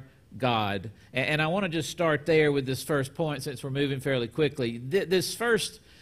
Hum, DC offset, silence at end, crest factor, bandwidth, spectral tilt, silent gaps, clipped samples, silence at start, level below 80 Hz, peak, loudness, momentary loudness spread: none; under 0.1%; 0.25 s; 16 dB; 15.5 kHz; -5 dB/octave; none; under 0.1%; 0 s; -58 dBFS; -12 dBFS; -28 LUFS; 9 LU